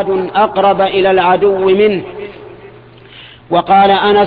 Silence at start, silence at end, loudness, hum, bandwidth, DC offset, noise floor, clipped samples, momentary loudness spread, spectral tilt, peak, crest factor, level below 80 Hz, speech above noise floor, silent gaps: 0 s; 0 s; -11 LUFS; none; 4.9 kHz; under 0.1%; -37 dBFS; under 0.1%; 12 LU; -8.5 dB/octave; 0 dBFS; 12 dB; -46 dBFS; 27 dB; none